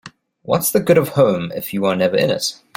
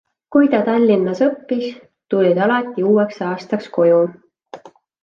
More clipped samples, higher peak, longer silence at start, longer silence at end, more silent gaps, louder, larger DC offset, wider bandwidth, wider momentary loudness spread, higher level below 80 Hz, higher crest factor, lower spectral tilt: neither; about the same, -2 dBFS vs -2 dBFS; second, 0.05 s vs 0.3 s; second, 0.2 s vs 0.35 s; neither; about the same, -17 LUFS vs -17 LUFS; neither; first, 17 kHz vs 7.2 kHz; about the same, 7 LU vs 9 LU; first, -56 dBFS vs -66 dBFS; about the same, 16 dB vs 14 dB; second, -5 dB/octave vs -8 dB/octave